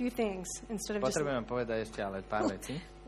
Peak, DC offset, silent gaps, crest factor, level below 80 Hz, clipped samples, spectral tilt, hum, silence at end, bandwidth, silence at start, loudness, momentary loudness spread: -20 dBFS; under 0.1%; none; 16 dB; -54 dBFS; under 0.1%; -4.5 dB/octave; none; 0 s; 13.5 kHz; 0 s; -35 LUFS; 7 LU